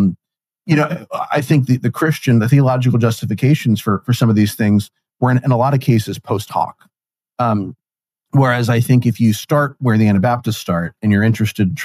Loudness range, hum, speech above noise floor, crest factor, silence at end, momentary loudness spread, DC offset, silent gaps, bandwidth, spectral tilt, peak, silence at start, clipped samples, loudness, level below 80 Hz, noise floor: 4 LU; none; 71 dB; 14 dB; 0 s; 8 LU; under 0.1%; none; 15.5 kHz; -7 dB/octave; -2 dBFS; 0 s; under 0.1%; -16 LUFS; -56 dBFS; -86 dBFS